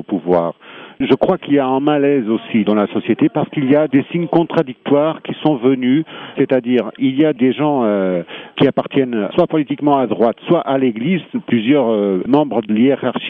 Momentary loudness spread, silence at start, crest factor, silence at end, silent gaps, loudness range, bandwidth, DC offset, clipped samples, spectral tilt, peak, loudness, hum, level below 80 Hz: 5 LU; 0 s; 14 dB; 0 s; none; 1 LU; 4.3 kHz; under 0.1%; under 0.1%; -9.5 dB/octave; 0 dBFS; -16 LUFS; none; -56 dBFS